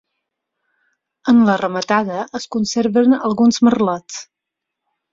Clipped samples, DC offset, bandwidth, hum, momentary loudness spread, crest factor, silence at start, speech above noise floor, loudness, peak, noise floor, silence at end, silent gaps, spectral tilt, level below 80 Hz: under 0.1%; under 0.1%; 7.6 kHz; none; 12 LU; 16 dB; 1.25 s; 66 dB; -16 LUFS; -2 dBFS; -81 dBFS; 0.9 s; none; -5 dB/octave; -58 dBFS